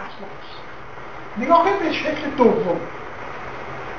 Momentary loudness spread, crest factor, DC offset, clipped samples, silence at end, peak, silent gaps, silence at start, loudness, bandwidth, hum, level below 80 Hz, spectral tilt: 20 LU; 20 dB; 2%; under 0.1%; 0 s; -2 dBFS; none; 0 s; -20 LUFS; 7.2 kHz; none; -50 dBFS; -6 dB/octave